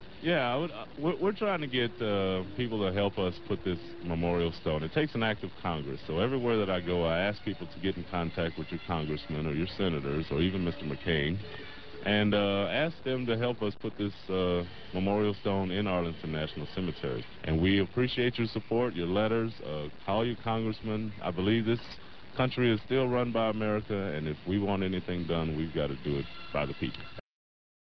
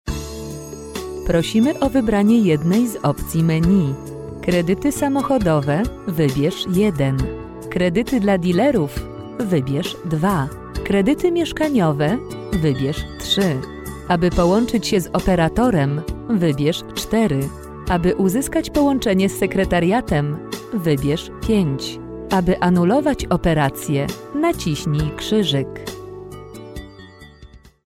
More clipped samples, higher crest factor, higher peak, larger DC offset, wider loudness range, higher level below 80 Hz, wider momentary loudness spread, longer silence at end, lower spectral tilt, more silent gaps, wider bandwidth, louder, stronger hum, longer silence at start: neither; about the same, 18 dB vs 14 dB; second, -14 dBFS vs -6 dBFS; first, 0.6% vs under 0.1%; about the same, 2 LU vs 2 LU; second, -50 dBFS vs -36 dBFS; second, 8 LU vs 13 LU; first, 0.45 s vs 0.3 s; first, -9 dB/octave vs -6 dB/octave; neither; second, 6 kHz vs 16.5 kHz; second, -31 LUFS vs -19 LUFS; neither; about the same, 0 s vs 0.05 s